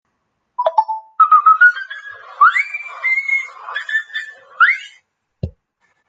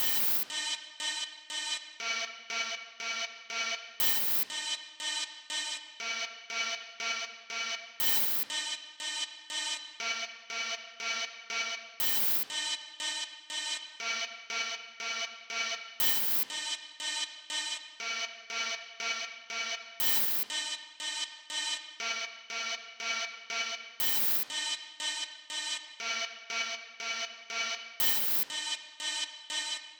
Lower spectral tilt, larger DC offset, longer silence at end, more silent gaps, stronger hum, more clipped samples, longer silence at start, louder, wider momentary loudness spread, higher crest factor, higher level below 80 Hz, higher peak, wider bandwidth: first, -3.5 dB/octave vs 2 dB/octave; neither; first, 0.6 s vs 0 s; neither; neither; neither; first, 0.6 s vs 0 s; first, -14 LUFS vs -32 LUFS; first, 21 LU vs 10 LU; about the same, 16 dB vs 20 dB; first, -52 dBFS vs -86 dBFS; first, -2 dBFS vs -14 dBFS; second, 7.8 kHz vs over 20 kHz